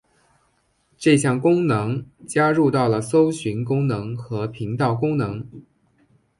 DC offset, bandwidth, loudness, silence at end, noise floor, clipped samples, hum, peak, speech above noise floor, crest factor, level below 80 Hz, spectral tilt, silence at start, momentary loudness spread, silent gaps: under 0.1%; 11.5 kHz; -21 LUFS; 0.8 s; -65 dBFS; under 0.1%; none; -4 dBFS; 45 dB; 18 dB; -56 dBFS; -6.5 dB/octave; 1 s; 11 LU; none